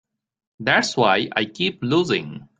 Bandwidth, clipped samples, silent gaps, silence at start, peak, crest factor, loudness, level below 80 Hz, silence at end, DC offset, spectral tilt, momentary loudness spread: 9.4 kHz; under 0.1%; none; 0.6 s; -2 dBFS; 20 dB; -20 LUFS; -62 dBFS; 0.15 s; under 0.1%; -4.5 dB/octave; 6 LU